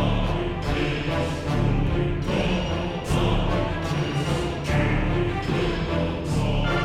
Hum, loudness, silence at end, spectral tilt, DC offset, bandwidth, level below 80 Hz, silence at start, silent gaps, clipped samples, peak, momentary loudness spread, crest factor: none; -25 LUFS; 0 s; -6.5 dB/octave; 0.2%; 14 kHz; -30 dBFS; 0 s; none; under 0.1%; -10 dBFS; 3 LU; 14 dB